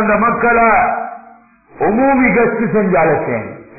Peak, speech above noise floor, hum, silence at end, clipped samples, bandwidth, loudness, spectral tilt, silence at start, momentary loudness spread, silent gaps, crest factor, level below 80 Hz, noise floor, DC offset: -2 dBFS; 31 dB; none; 0.15 s; under 0.1%; 2.7 kHz; -13 LUFS; -16 dB/octave; 0 s; 10 LU; none; 12 dB; -42 dBFS; -43 dBFS; under 0.1%